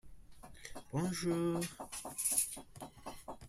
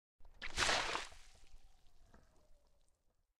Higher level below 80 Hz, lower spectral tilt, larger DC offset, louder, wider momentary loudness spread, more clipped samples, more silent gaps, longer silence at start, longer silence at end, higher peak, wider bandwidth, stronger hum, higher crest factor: about the same, -62 dBFS vs -58 dBFS; first, -4 dB/octave vs -1 dB/octave; neither; about the same, -37 LUFS vs -37 LUFS; about the same, 19 LU vs 17 LU; neither; neither; second, 0.05 s vs 0.2 s; second, 0 s vs 0.85 s; about the same, -18 dBFS vs -18 dBFS; about the same, 16 kHz vs 15.5 kHz; neither; about the same, 22 dB vs 26 dB